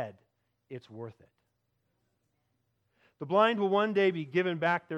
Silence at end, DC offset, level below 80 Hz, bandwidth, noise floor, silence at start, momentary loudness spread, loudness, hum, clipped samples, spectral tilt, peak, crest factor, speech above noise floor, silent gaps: 0 s; under 0.1%; -84 dBFS; 7.8 kHz; -78 dBFS; 0 s; 21 LU; -28 LUFS; 60 Hz at -70 dBFS; under 0.1%; -7 dB/octave; -12 dBFS; 20 dB; 49 dB; none